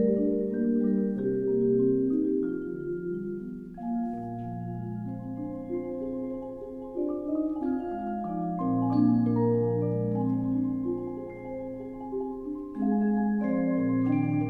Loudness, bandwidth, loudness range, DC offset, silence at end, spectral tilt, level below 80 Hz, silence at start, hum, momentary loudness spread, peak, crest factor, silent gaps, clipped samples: -29 LUFS; 4.7 kHz; 7 LU; under 0.1%; 0 s; -12 dB/octave; -56 dBFS; 0 s; none; 12 LU; -12 dBFS; 16 dB; none; under 0.1%